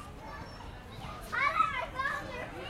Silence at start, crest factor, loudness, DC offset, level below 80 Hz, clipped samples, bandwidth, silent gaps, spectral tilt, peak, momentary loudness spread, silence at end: 0 s; 20 dB; -32 LUFS; under 0.1%; -52 dBFS; under 0.1%; 16 kHz; none; -4 dB/octave; -16 dBFS; 17 LU; 0 s